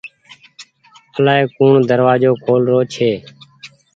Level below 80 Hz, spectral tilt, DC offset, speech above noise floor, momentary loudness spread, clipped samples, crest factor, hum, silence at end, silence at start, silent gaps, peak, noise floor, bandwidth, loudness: -58 dBFS; -7 dB/octave; under 0.1%; 36 dB; 11 LU; under 0.1%; 16 dB; none; 0.3 s; 0.05 s; none; 0 dBFS; -49 dBFS; 7.8 kHz; -14 LUFS